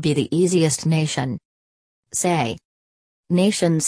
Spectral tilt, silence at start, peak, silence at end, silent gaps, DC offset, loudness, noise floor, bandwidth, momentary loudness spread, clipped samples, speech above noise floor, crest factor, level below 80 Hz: -5 dB/octave; 0 s; -6 dBFS; 0 s; 1.45-2.03 s, 2.65-3.24 s; under 0.1%; -20 LUFS; under -90 dBFS; 11 kHz; 10 LU; under 0.1%; over 71 dB; 16 dB; -58 dBFS